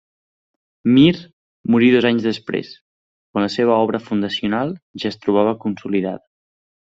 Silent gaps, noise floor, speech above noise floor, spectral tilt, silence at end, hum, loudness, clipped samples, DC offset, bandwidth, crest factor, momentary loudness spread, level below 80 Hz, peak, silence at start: 1.33-1.64 s, 2.81-3.34 s, 4.82-4.94 s; under -90 dBFS; over 73 dB; -7 dB/octave; 0.8 s; none; -18 LUFS; under 0.1%; under 0.1%; 7.8 kHz; 18 dB; 13 LU; -58 dBFS; -2 dBFS; 0.85 s